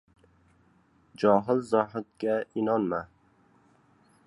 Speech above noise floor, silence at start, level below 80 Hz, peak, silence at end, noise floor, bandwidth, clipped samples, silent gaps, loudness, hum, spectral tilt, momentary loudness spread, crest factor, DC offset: 37 dB; 1.2 s; -68 dBFS; -8 dBFS; 1.2 s; -64 dBFS; 11.5 kHz; under 0.1%; none; -27 LUFS; none; -7.5 dB/octave; 9 LU; 22 dB; under 0.1%